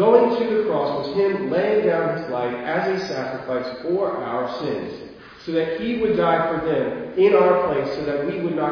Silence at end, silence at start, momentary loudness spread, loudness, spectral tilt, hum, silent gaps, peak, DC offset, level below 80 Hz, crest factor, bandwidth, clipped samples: 0 s; 0 s; 10 LU; -21 LUFS; -7 dB/octave; none; none; -2 dBFS; under 0.1%; -56 dBFS; 18 dB; 5.4 kHz; under 0.1%